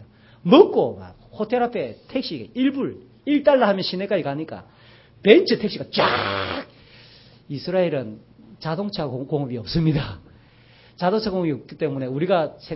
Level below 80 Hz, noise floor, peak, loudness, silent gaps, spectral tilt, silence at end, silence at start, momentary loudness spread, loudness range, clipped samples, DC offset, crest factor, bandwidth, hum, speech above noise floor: -50 dBFS; -51 dBFS; 0 dBFS; -22 LUFS; none; -10 dB/octave; 0 s; 0 s; 17 LU; 6 LU; under 0.1%; under 0.1%; 22 dB; 5.8 kHz; none; 30 dB